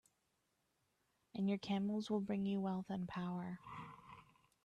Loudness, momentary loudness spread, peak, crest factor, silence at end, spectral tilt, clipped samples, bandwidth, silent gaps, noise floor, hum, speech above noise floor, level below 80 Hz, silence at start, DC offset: -42 LUFS; 16 LU; -28 dBFS; 14 dB; 0.4 s; -7.5 dB/octave; under 0.1%; 9.2 kHz; none; -84 dBFS; none; 43 dB; -78 dBFS; 1.35 s; under 0.1%